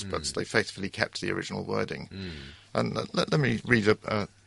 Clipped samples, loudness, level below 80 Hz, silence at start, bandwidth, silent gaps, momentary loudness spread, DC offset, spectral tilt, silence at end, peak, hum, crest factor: under 0.1%; -29 LUFS; -54 dBFS; 0 s; 11.5 kHz; none; 13 LU; under 0.1%; -5 dB/octave; 0.2 s; -6 dBFS; none; 24 dB